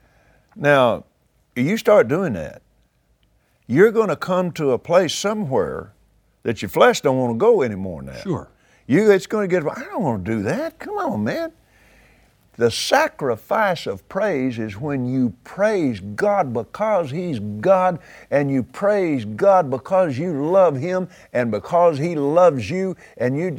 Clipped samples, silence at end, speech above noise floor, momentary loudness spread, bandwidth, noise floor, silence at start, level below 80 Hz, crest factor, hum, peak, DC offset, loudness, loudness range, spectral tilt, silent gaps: under 0.1%; 0 s; 43 dB; 12 LU; 20 kHz; -62 dBFS; 0.55 s; -56 dBFS; 20 dB; none; 0 dBFS; under 0.1%; -20 LUFS; 3 LU; -6 dB/octave; none